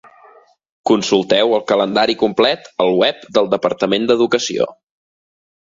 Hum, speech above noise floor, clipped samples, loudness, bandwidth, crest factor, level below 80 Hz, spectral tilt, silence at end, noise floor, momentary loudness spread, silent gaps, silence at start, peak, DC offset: none; 33 dB; under 0.1%; -16 LUFS; 7.8 kHz; 16 dB; -58 dBFS; -4 dB/octave; 1.05 s; -48 dBFS; 4 LU; none; 0.85 s; 0 dBFS; under 0.1%